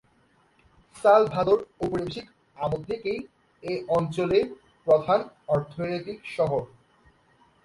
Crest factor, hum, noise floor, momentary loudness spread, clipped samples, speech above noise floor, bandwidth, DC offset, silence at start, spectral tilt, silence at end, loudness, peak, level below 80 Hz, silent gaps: 20 dB; none; -63 dBFS; 15 LU; under 0.1%; 39 dB; 11.5 kHz; under 0.1%; 0.95 s; -7 dB/octave; 1 s; -26 LUFS; -6 dBFS; -58 dBFS; none